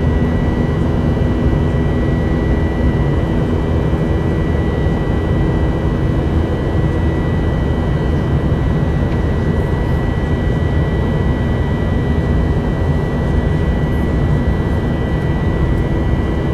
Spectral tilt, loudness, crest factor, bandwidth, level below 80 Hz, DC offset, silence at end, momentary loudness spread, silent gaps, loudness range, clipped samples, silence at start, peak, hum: -9 dB/octave; -16 LUFS; 12 dB; 9 kHz; -20 dBFS; under 0.1%; 0 s; 1 LU; none; 1 LU; under 0.1%; 0 s; -2 dBFS; none